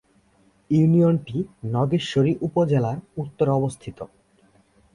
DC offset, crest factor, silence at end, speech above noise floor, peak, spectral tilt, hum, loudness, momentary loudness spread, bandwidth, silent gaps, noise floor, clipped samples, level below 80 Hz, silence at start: under 0.1%; 16 dB; 0.9 s; 39 dB; -8 dBFS; -8 dB/octave; none; -22 LUFS; 17 LU; 11 kHz; none; -60 dBFS; under 0.1%; -56 dBFS; 0.7 s